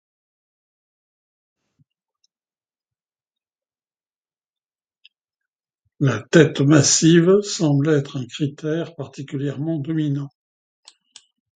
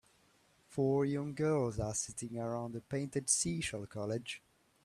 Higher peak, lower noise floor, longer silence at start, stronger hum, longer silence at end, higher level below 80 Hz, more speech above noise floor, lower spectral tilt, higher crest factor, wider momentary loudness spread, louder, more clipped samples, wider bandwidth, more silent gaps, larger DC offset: first, 0 dBFS vs -16 dBFS; first, under -90 dBFS vs -70 dBFS; first, 6 s vs 0.7 s; neither; first, 1.3 s vs 0.45 s; about the same, -64 dBFS vs -62 dBFS; first, over 72 dB vs 34 dB; about the same, -5 dB/octave vs -4.5 dB/octave; about the same, 22 dB vs 20 dB; first, 16 LU vs 10 LU; first, -18 LUFS vs -36 LUFS; neither; second, 9.4 kHz vs 13.5 kHz; neither; neither